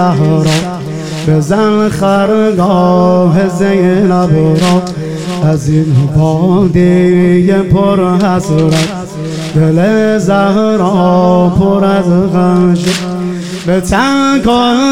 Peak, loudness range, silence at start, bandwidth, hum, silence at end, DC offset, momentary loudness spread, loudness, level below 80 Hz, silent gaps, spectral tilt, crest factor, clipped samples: 0 dBFS; 1 LU; 0 s; 13 kHz; none; 0 s; 2%; 8 LU; -10 LUFS; -34 dBFS; none; -7 dB/octave; 10 dB; under 0.1%